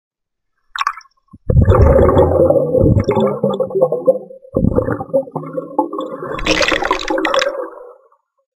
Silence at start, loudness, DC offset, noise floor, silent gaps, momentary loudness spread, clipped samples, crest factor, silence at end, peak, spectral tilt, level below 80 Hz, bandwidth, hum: 0.75 s; -15 LUFS; under 0.1%; -73 dBFS; none; 14 LU; under 0.1%; 16 dB; 0.65 s; 0 dBFS; -6.5 dB/octave; -26 dBFS; 12.5 kHz; none